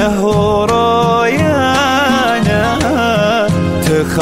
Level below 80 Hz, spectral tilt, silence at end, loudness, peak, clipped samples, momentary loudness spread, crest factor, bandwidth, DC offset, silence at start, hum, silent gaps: -32 dBFS; -5.5 dB/octave; 0 s; -12 LUFS; -2 dBFS; under 0.1%; 2 LU; 10 dB; 16 kHz; under 0.1%; 0 s; none; none